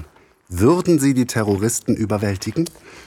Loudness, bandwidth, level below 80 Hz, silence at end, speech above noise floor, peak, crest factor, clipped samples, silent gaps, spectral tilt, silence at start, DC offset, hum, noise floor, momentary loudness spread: -19 LUFS; 17.5 kHz; -46 dBFS; 0.05 s; 26 dB; -4 dBFS; 16 dB; under 0.1%; none; -6 dB/octave; 0 s; under 0.1%; none; -45 dBFS; 8 LU